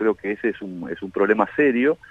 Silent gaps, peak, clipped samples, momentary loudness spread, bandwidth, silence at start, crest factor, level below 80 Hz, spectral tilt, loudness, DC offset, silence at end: none; -4 dBFS; under 0.1%; 13 LU; 4 kHz; 0 s; 18 dB; -60 dBFS; -8 dB/octave; -22 LUFS; under 0.1%; 0.15 s